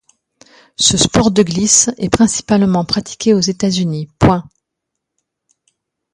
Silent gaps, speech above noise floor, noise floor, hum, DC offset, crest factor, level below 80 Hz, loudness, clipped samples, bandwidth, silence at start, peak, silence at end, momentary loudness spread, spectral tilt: none; 64 dB; -77 dBFS; none; under 0.1%; 16 dB; -38 dBFS; -13 LUFS; under 0.1%; 11.5 kHz; 0.8 s; 0 dBFS; 1.7 s; 8 LU; -4 dB/octave